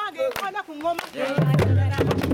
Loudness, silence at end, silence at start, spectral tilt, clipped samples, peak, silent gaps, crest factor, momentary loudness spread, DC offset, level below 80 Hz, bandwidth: -23 LUFS; 0 s; 0 s; -7 dB/octave; under 0.1%; -8 dBFS; none; 14 dB; 9 LU; under 0.1%; -48 dBFS; 17 kHz